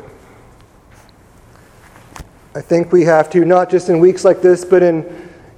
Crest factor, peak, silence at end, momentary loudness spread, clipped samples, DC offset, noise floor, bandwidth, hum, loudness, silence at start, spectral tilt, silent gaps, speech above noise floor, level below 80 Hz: 14 dB; 0 dBFS; 0.35 s; 13 LU; under 0.1%; under 0.1%; -45 dBFS; 10 kHz; none; -12 LUFS; 2.2 s; -7 dB/octave; none; 33 dB; -50 dBFS